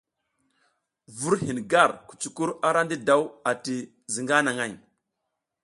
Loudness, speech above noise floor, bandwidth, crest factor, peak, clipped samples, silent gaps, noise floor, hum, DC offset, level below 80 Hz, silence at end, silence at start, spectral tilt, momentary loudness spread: -25 LUFS; 57 dB; 11.5 kHz; 24 dB; -4 dBFS; under 0.1%; none; -82 dBFS; none; under 0.1%; -66 dBFS; 0.85 s; 1.1 s; -4 dB/octave; 12 LU